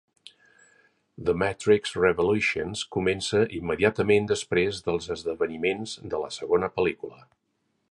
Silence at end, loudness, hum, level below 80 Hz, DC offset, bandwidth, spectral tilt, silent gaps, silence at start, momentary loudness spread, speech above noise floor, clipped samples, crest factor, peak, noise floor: 0.75 s; -26 LUFS; none; -52 dBFS; under 0.1%; 11.5 kHz; -5 dB/octave; none; 1.2 s; 9 LU; 38 dB; under 0.1%; 20 dB; -6 dBFS; -63 dBFS